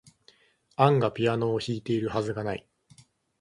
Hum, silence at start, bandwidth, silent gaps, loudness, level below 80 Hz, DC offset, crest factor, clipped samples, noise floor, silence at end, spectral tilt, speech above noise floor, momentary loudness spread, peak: none; 0.8 s; 11.5 kHz; none; -27 LUFS; -60 dBFS; under 0.1%; 22 dB; under 0.1%; -62 dBFS; 0.8 s; -7 dB/octave; 36 dB; 12 LU; -6 dBFS